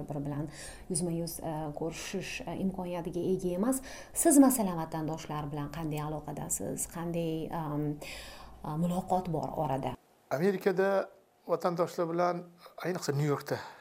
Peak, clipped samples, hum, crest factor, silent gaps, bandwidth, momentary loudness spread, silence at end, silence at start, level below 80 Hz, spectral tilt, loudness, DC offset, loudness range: -12 dBFS; under 0.1%; none; 22 dB; none; 16 kHz; 11 LU; 0 s; 0 s; -56 dBFS; -5.5 dB/octave; -32 LUFS; under 0.1%; 6 LU